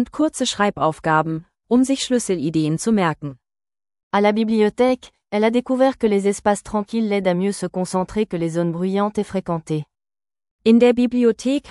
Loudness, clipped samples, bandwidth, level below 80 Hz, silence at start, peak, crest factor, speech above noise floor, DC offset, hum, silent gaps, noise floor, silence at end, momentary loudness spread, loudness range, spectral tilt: -20 LUFS; under 0.1%; 12 kHz; -52 dBFS; 0 s; -4 dBFS; 16 dB; over 71 dB; under 0.1%; none; 4.03-4.11 s, 10.51-10.59 s; under -90 dBFS; 0 s; 8 LU; 3 LU; -5.5 dB/octave